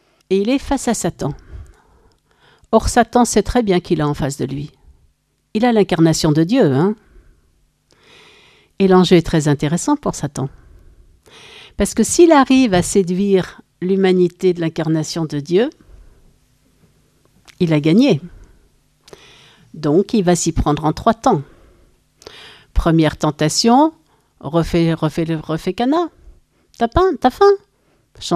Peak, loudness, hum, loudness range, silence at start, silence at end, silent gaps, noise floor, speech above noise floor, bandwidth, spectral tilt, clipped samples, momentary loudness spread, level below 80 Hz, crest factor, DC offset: 0 dBFS; -16 LUFS; none; 4 LU; 0.3 s; 0 s; none; -59 dBFS; 44 dB; 15 kHz; -5.5 dB/octave; under 0.1%; 12 LU; -36 dBFS; 18 dB; under 0.1%